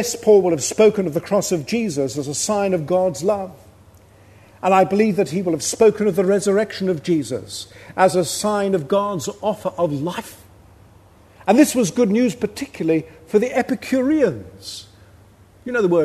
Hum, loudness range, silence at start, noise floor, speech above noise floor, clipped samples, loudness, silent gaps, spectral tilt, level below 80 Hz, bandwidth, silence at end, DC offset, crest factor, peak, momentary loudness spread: none; 4 LU; 0 s; -49 dBFS; 30 dB; under 0.1%; -19 LUFS; none; -5 dB/octave; -56 dBFS; 13.5 kHz; 0 s; under 0.1%; 18 dB; 0 dBFS; 12 LU